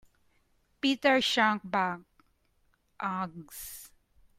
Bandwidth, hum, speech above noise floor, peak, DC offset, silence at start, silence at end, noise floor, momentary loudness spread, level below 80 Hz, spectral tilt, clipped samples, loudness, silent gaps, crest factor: 16 kHz; none; 41 dB; -12 dBFS; under 0.1%; 0.85 s; 0.5 s; -71 dBFS; 18 LU; -68 dBFS; -3.5 dB/octave; under 0.1%; -28 LUFS; none; 20 dB